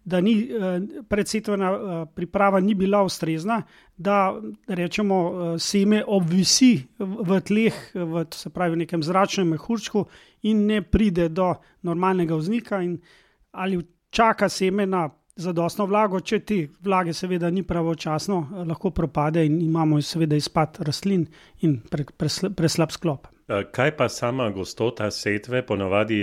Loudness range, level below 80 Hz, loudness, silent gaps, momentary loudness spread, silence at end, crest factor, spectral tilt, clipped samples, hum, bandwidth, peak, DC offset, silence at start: 4 LU; -46 dBFS; -23 LUFS; none; 9 LU; 0 s; 18 dB; -5.5 dB/octave; under 0.1%; none; 15.5 kHz; -6 dBFS; under 0.1%; 0.05 s